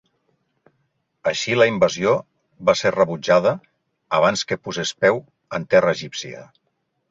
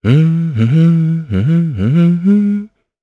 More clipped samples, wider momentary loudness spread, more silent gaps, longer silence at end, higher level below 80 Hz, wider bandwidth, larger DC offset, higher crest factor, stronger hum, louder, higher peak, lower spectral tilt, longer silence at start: neither; first, 13 LU vs 5 LU; neither; first, 0.65 s vs 0.35 s; second, -60 dBFS vs -46 dBFS; first, 7.8 kHz vs 4.2 kHz; neither; first, 18 dB vs 12 dB; neither; second, -20 LUFS vs -13 LUFS; about the same, -2 dBFS vs 0 dBFS; second, -4 dB/octave vs -10 dB/octave; first, 1.25 s vs 0.05 s